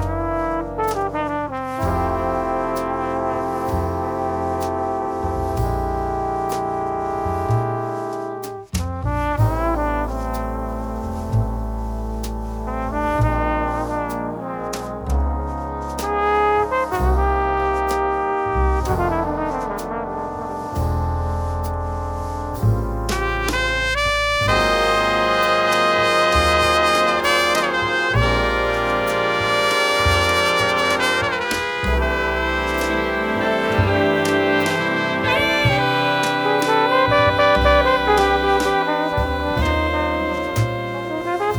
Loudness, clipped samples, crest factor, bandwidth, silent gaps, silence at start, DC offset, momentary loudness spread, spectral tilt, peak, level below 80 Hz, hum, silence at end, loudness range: -20 LUFS; under 0.1%; 18 dB; over 20 kHz; none; 0 s; under 0.1%; 10 LU; -5 dB/octave; 0 dBFS; -30 dBFS; none; 0 s; 7 LU